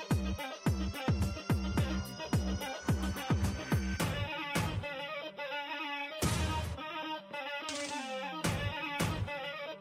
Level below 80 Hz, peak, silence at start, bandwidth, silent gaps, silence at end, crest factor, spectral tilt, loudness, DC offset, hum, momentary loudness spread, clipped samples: -44 dBFS; -20 dBFS; 0 s; 16 kHz; none; 0 s; 16 dB; -5 dB/octave; -36 LUFS; under 0.1%; none; 6 LU; under 0.1%